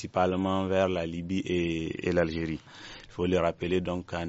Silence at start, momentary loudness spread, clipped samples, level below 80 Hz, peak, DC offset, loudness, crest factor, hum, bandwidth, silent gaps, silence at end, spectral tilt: 0 s; 9 LU; under 0.1%; -52 dBFS; -12 dBFS; under 0.1%; -29 LUFS; 18 dB; none; 8 kHz; none; 0 s; -5.5 dB/octave